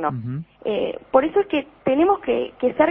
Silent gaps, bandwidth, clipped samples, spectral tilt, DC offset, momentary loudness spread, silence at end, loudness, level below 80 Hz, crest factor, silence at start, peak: none; 3.9 kHz; under 0.1%; -10.5 dB/octave; under 0.1%; 9 LU; 0 s; -22 LUFS; -54 dBFS; 18 dB; 0 s; -2 dBFS